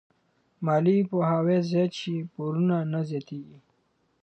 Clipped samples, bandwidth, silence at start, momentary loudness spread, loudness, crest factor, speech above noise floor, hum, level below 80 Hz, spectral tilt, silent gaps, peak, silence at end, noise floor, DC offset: under 0.1%; 8.2 kHz; 0.6 s; 10 LU; -26 LUFS; 16 dB; 45 dB; none; -74 dBFS; -8.5 dB/octave; none; -12 dBFS; 0.8 s; -70 dBFS; under 0.1%